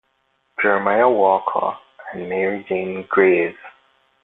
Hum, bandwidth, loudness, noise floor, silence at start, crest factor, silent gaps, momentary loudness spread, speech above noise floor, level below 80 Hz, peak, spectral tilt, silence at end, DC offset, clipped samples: none; 4 kHz; -19 LUFS; -66 dBFS; 0.6 s; 18 dB; none; 16 LU; 48 dB; -64 dBFS; -2 dBFS; -9 dB/octave; 0.55 s; under 0.1%; under 0.1%